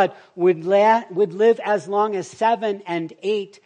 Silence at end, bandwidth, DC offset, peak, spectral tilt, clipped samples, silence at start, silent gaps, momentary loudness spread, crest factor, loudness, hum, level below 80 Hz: 0.2 s; 9.6 kHz; under 0.1%; -4 dBFS; -6 dB/octave; under 0.1%; 0 s; none; 8 LU; 16 dB; -20 LUFS; none; -76 dBFS